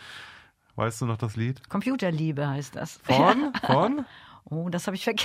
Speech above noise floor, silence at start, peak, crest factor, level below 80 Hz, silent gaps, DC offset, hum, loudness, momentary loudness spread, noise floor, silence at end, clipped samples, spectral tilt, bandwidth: 26 dB; 0 s; -6 dBFS; 22 dB; -62 dBFS; none; under 0.1%; none; -26 LUFS; 17 LU; -52 dBFS; 0 s; under 0.1%; -5.5 dB/octave; 16 kHz